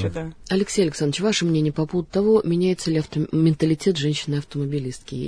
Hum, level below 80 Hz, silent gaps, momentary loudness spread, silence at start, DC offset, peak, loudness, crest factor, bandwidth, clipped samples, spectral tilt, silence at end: none; -48 dBFS; none; 8 LU; 0 s; under 0.1%; -6 dBFS; -22 LUFS; 16 dB; 11 kHz; under 0.1%; -6 dB/octave; 0 s